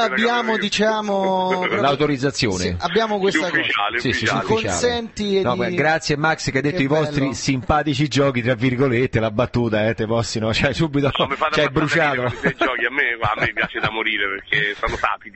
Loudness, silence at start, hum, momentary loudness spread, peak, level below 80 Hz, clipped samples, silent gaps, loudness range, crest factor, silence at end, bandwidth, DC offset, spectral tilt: -19 LUFS; 0 s; none; 3 LU; 0 dBFS; -42 dBFS; under 0.1%; none; 1 LU; 18 dB; 0.05 s; 8.6 kHz; under 0.1%; -5 dB/octave